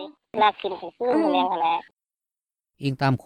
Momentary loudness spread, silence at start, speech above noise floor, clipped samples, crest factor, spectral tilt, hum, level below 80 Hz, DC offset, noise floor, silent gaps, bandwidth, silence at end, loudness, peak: 11 LU; 0 s; over 67 dB; under 0.1%; 18 dB; -7.5 dB/octave; none; -64 dBFS; under 0.1%; under -90 dBFS; none; 10 kHz; 0.1 s; -24 LUFS; -8 dBFS